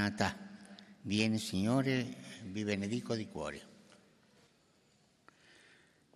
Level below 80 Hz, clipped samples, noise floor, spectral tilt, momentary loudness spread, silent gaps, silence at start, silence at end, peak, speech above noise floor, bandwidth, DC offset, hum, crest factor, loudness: -72 dBFS; under 0.1%; -70 dBFS; -5.5 dB/octave; 19 LU; none; 0 s; 2.45 s; -14 dBFS; 35 dB; 14 kHz; under 0.1%; none; 24 dB; -36 LUFS